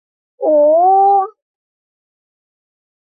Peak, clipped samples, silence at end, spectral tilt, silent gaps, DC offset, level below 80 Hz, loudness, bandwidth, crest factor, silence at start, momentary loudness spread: -4 dBFS; under 0.1%; 1.75 s; -10.5 dB/octave; none; under 0.1%; -68 dBFS; -12 LUFS; 1.7 kHz; 12 dB; 0.4 s; 10 LU